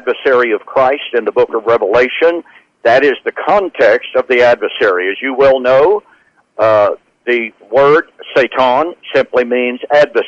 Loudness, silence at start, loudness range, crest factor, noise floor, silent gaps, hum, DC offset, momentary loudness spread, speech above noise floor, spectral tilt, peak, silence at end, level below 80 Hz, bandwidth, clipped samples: -12 LUFS; 0.05 s; 1 LU; 10 dB; -50 dBFS; none; none; under 0.1%; 6 LU; 38 dB; -5.5 dB/octave; -2 dBFS; 0 s; -50 dBFS; 7.6 kHz; under 0.1%